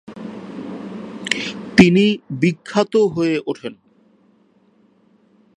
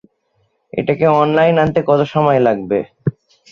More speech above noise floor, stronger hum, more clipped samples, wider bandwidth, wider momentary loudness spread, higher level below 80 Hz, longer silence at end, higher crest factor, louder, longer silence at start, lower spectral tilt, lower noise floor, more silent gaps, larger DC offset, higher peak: second, 39 dB vs 50 dB; neither; neither; first, 11 kHz vs 7 kHz; first, 20 LU vs 11 LU; about the same, -52 dBFS vs -50 dBFS; first, 1.85 s vs 0.4 s; first, 20 dB vs 14 dB; about the same, -17 LUFS vs -15 LUFS; second, 0.1 s vs 0.75 s; second, -6 dB/octave vs -8.5 dB/octave; second, -56 dBFS vs -63 dBFS; neither; neither; about the same, 0 dBFS vs -2 dBFS